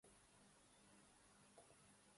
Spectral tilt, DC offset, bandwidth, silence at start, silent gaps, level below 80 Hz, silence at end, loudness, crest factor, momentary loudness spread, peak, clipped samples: -3 dB/octave; under 0.1%; 11.5 kHz; 0 s; none; -86 dBFS; 0 s; -69 LUFS; 18 dB; 2 LU; -52 dBFS; under 0.1%